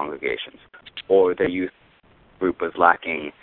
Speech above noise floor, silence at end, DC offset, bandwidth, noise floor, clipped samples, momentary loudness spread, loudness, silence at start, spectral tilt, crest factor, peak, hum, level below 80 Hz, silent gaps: 33 dB; 0.1 s; under 0.1%; 4.3 kHz; -55 dBFS; under 0.1%; 16 LU; -22 LUFS; 0 s; -9 dB/octave; 22 dB; 0 dBFS; none; -56 dBFS; none